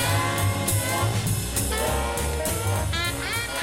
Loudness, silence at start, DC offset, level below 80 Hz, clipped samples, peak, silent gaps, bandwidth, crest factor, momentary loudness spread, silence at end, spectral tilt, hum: -25 LUFS; 0 s; 0.3%; -34 dBFS; under 0.1%; -10 dBFS; none; 17 kHz; 14 dB; 3 LU; 0 s; -3.5 dB/octave; none